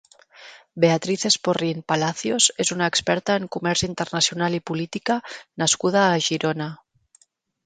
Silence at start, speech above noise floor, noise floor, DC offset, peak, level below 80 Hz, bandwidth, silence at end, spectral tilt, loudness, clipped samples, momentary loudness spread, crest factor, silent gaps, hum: 0.4 s; 39 dB; -62 dBFS; under 0.1%; -4 dBFS; -58 dBFS; 9.6 kHz; 0.9 s; -3 dB/octave; -22 LUFS; under 0.1%; 8 LU; 20 dB; none; none